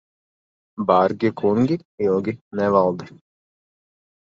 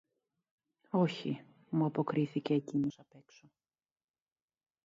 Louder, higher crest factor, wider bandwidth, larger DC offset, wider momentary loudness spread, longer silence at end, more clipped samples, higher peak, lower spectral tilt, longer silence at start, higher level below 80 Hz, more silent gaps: first, -20 LUFS vs -35 LUFS; about the same, 20 dB vs 18 dB; about the same, 7.4 kHz vs 7.6 kHz; neither; about the same, 9 LU vs 7 LU; second, 1.15 s vs 1.7 s; neither; first, -2 dBFS vs -18 dBFS; about the same, -8.5 dB/octave vs -8 dB/octave; second, 0.8 s vs 0.95 s; first, -58 dBFS vs -80 dBFS; first, 1.85-1.98 s, 2.41-2.51 s vs none